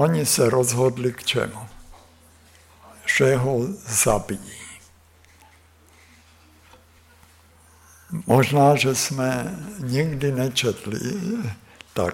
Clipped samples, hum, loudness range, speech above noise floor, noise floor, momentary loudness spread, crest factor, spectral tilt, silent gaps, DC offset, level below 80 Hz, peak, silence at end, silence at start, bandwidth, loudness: under 0.1%; none; 6 LU; 32 dB; -53 dBFS; 15 LU; 18 dB; -4.5 dB/octave; none; under 0.1%; -50 dBFS; -6 dBFS; 0 s; 0 s; 17 kHz; -22 LUFS